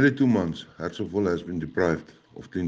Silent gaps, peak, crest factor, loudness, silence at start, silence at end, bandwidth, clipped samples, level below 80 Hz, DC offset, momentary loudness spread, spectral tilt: none; -8 dBFS; 18 dB; -27 LUFS; 0 s; 0 s; 7.6 kHz; under 0.1%; -54 dBFS; under 0.1%; 13 LU; -7.5 dB/octave